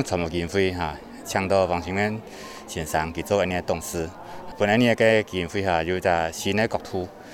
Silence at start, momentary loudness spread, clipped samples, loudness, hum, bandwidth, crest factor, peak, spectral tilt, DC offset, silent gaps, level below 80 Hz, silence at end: 0 s; 14 LU; under 0.1%; -24 LUFS; none; 17 kHz; 20 dB; -4 dBFS; -5 dB/octave; under 0.1%; none; -48 dBFS; 0 s